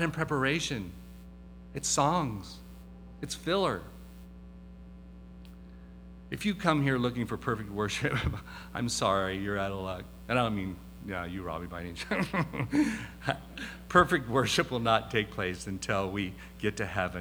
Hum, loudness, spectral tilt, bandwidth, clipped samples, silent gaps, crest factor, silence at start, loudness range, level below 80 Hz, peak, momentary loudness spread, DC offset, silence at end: none; -31 LUFS; -4.5 dB/octave; over 20 kHz; under 0.1%; none; 24 dB; 0 s; 8 LU; -50 dBFS; -8 dBFS; 23 LU; under 0.1%; 0 s